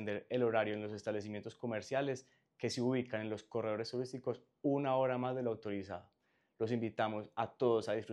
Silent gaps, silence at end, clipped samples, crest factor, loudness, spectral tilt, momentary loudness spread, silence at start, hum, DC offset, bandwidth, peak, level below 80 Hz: none; 0 s; under 0.1%; 18 dB; -38 LUFS; -6 dB/octave; 9 LU; 0 s; none; under 0.1%; 11.5 kHz; -20 dBFS; -82 dBFS